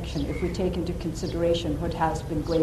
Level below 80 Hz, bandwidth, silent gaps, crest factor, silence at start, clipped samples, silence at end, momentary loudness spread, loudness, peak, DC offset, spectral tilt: -36 dBFS; 13.5 kHz; none; 14 dB; 0 s; under 0.1%; 0 s; 5 LU; -28 LUFS; -12 dBFS; under 0.1%; -6.5 dB/octave